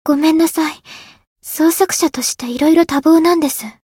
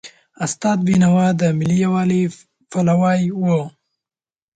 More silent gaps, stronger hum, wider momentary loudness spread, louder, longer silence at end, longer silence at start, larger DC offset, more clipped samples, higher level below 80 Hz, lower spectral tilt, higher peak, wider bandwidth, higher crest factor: first, 1.27-1.36 s vs none; neither; about the same, 12 LU vs 10 LU; first, -14 LUFS vs -18 LUFS; second, 0.2 s vs 0.9 s; about the same, 0.05 s vs 0.05 s; neither; neither; about the same, -54 dBFS vs -56 dBFS; second, -2.5 dB/octave vs -7 dB/octave; first, 0 dBFS vs -6 dBFS; first, 17 kHz vs 9.2 kHz; about the same, 14 dB vs 12 dB